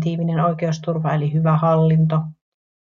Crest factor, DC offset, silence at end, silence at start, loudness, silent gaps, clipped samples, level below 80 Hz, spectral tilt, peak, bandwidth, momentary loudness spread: 14 dB; under 0.1%; 0.6 s; 0 s; -19 LUFS; none; under 0.1%; -54 dBFS; -8.5 dB/octave; -4 dBFS; 6.6 kHz; 7 LU